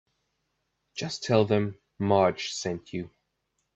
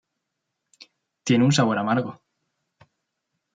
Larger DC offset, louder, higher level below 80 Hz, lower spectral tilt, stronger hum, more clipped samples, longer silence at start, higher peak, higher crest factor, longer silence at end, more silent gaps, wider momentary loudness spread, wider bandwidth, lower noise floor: neither; second, -27 LUFS vs -21 LUFS; about the same, -66 dBFS vs -68 dBFS; about the same, -5.5 dB/octave vs -5.5 dB/octave; neither; neither; second, 0.95 s vs 1.25 s; about the same, -8 dBFS vs -8 dBFS; about the same, 22 dB vs 18 dB; second, 0.7 s vs 1.4 s; neither; about the same, 14 LU vs 15 LU; second, 8.4 kHz vs 9.4 kHz; about the same, -78 dBFS vs -80 dBFS